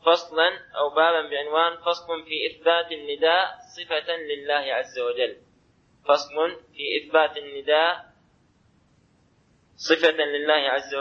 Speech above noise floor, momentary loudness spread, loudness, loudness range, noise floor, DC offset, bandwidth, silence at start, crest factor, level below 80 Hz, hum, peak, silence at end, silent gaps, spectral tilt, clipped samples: 38 dB; 9 LU; -24 LUFS; 3 LU; -62 dBFS; under 0.1%; 7 kHz; 0.05 s; 20 dB; -70 dBFS; none; -4 dBFS; 0 s; none; -2 dB/octave; under 0.1%